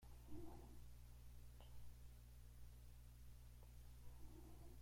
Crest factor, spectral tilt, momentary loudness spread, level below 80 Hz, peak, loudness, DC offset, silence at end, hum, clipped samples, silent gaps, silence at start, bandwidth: 16 dB; -6 dB/octave; 4 LU; -62 dBFS; -42 dBFS; -64 LUFS; under 0.1%; 0 s; 60 Hz at -60 dBFS; under 0.1%; none; 0 s; 16.5 kHz